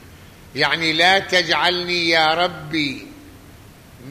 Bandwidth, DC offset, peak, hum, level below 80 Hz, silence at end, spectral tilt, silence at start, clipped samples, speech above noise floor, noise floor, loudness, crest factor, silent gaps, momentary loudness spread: 15 kHz; under 0.1%; -2 dBFS; none; -52 dBFS; 0 s; -3 dB/octave; 0.05 s; under 0.1%; 25 dB; -44 dBFS; -17 LUFS; 18 dB; none; 9 LU